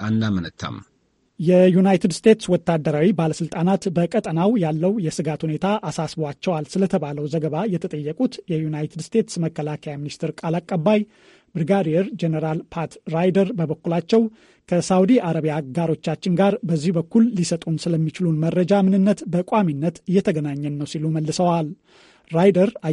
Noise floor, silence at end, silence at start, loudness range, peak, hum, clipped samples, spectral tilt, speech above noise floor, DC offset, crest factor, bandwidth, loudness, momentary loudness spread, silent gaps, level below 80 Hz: -49 dBFS; 0 s; 0 s; 5 LU; -2 dBFS; none; under 0.1%; -7 dB/octave; 29 dB; under 0.1%; 18 dB; 11.5 kHz; -21 LUFS; 10 LU; none; -58 dBFS